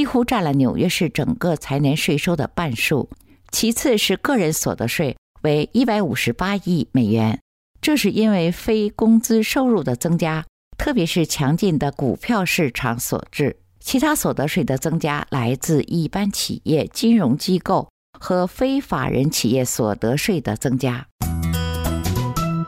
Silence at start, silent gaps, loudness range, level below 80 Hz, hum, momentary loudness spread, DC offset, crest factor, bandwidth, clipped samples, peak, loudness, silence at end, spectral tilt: 0 s; 5.18-5.34 s, 7.41-7.74 s, 10.49-10.71 s, 17.90-18.13 s, 21.12-21.19 s; 2 LU; -42 dBFS; none; 6 LU; under 0.1%; 12 dB; 16 kHz; under 0.1%; -8 dBFS; -20 LUFS; 0 s; -5 dB/octave